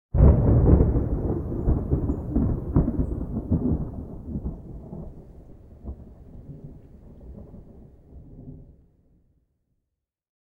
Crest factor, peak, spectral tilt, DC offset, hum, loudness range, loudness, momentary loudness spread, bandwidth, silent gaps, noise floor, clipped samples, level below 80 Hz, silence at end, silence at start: 22 dB; -4 dBFS; -13.5 dB/octave; under 0.1%; none; 24 LU; -24 LUFS; 26 LU; 2.3 kHz; none; -83 dBFS; under 0.1%; -28 dBFS; 1.8 s; 0.15 s